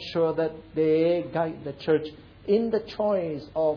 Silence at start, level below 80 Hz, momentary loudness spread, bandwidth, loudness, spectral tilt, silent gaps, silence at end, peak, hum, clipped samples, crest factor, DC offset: 0 s; -58 dBFS; 8 LU; 5.4 kHz; -26 LUFS; -8 dB/octave; none; 0 s; -12 dBFS; none; under 0.1%; 14 dB; under 0.1%